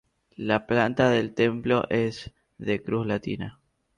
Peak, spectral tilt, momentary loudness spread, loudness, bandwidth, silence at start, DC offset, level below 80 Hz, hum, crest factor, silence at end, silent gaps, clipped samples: -8 dBFS; -6.5 dB/octave; 13 LU; -26 LUFS; 10.5 kHz; 0.4 s; under 0.1%; -56 dBFS; none; 18 dB; 0.45 s; none; under 0.1%